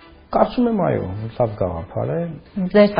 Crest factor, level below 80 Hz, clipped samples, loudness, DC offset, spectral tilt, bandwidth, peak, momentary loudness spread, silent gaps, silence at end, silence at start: 18 dB; -44 dBFS; under 0.1%; -21 LUFS; under 0.1%; -6.5 dB/octave; 5.2 kHz; 0 dBFS; 9 LU; none; 0 s; 0.3 s